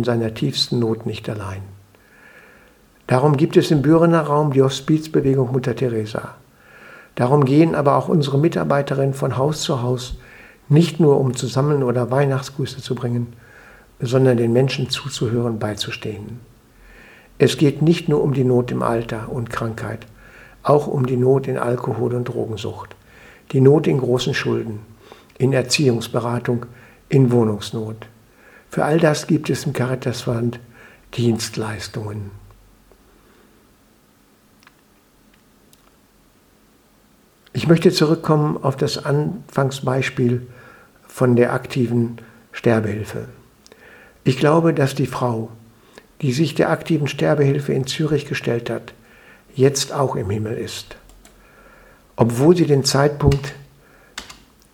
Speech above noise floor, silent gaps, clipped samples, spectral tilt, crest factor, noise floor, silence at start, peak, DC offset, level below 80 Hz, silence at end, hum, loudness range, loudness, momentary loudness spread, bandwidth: 37 dB; none; under 0.1%; -6.5 dB/octave; 20 dB; -55 dBFS; 0 s; 0 dBFS; under 0.1%; -46 dBFS; 0.4 s; none; 5 LU; -19 LUFS; 15 LU; 17 kHz